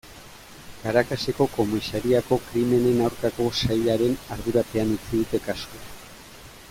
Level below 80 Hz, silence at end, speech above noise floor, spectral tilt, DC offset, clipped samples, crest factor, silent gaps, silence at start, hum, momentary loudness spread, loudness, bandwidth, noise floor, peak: -46 dBFS; 0 s; 21 dB; -6 dB/octave; under 0.1%; under 0.1%; 18 dB; none; 0.05 s; none; 22 LU; -24 LUFS; 16.5 kHz; -45 dBFS; -6 dBFS